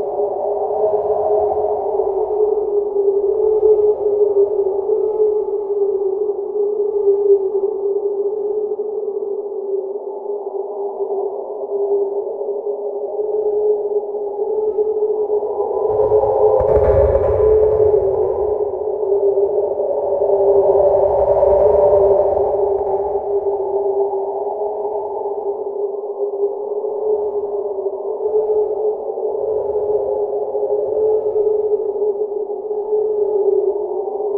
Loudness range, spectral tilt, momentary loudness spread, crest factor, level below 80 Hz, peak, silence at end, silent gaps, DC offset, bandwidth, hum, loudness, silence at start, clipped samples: 7 LU; -12 dB/octave; 9 LU; 16 dB; -40 dBFS; -2 dBFS; 0 s; none; under 0.1%; 2.4 kHz; none; -18 LUFS; 0 s; under 0.1%